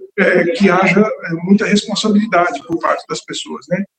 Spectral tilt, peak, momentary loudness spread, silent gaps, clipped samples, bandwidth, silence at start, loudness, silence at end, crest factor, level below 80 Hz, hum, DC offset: -5.5 dB/octave; 0 dBFS; 11 LU; none; under 0.1%; 9 kHz; 0 s; -15 LUFS; 0.15 s; 14 dB; -56 dBFS; none; under 0.1%